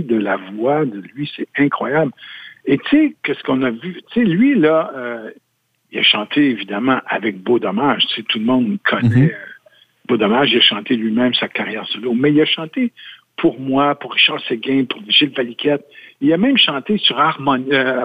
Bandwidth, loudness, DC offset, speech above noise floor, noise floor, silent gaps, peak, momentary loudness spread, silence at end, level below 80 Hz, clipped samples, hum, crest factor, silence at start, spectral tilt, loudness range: 5.2 kHz; -16 LUFS; under 0.1%; 34 dB; -51 dBFS; none; 0 dBFS; 10 LU; 0 s; -58 dBFS; under 0.1%; none; 16 dB; 0 s; -7.5 dB/octave; 3 LU